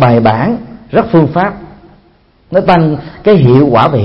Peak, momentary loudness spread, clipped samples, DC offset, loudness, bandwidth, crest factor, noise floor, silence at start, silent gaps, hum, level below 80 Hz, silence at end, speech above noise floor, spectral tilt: 0 dBFS; 9 LU; 0.2%; under 0.1%; -10 LUFS; 5.8 kHz; 10 dB; -47 dBFS; 0 s; none; none; -38 dBFS; 0 s; 39 dB; -10 dB/octave